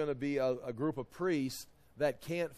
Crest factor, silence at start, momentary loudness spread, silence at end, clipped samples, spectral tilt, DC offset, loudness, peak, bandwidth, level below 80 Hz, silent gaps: 16 dB; 0 s; 6 LU; 0 s; under 0.1%; -6 dB/octave; under 0.1%; -36 LUFS; -18 dBFS; 14.5 kHz; -64 dBFS; none